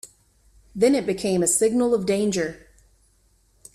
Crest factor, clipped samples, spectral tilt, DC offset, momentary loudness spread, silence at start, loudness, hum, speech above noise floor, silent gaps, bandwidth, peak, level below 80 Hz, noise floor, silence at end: 16 dB; under 0.1%; -4.5 dB/octave; under 0.1%; 8 LU; 0.05 s; -21 LUFS; none; 41 dB; none; 15 kHz; -8 dBFS; -56 dBFS; -62 dBFS; 1.2 s